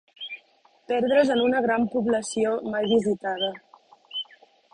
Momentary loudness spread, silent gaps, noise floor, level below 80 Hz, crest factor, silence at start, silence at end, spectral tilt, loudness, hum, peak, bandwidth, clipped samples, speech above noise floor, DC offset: 16 LU; none; -60 dBFS; -64 dBFS; 18 dB; 0.2 s; 0.5 s; -4.5 dB/octave; -24 LUFS; none; -8 dBFS; 11 kHz; under 0.1%; 37 dB; under 0.1%